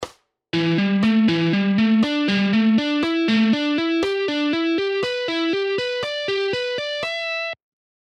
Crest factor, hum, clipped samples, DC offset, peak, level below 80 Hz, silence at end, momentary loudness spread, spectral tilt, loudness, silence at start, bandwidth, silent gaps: 12 dB; none; under 0.1%; under 0.1%; -8 dBFS; -60 dBFS; 0.45 s; 7 LU; -6 dB/octave; -20 LUFS; 0 s; 9 kHz; none